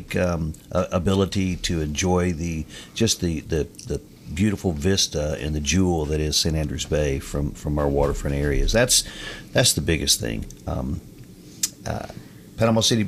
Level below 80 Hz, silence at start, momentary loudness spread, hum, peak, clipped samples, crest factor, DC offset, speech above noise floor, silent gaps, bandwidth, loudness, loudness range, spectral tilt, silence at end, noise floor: -34 dBFS; 0 s; 13 LU; none; -6 dBFS; under 0.1%; 18 dB; under 0.1%; 20 dB; none; 16 kHz; -23 LUFS; 3 LU; -4 dB/octave; 0 s; -43 dBFS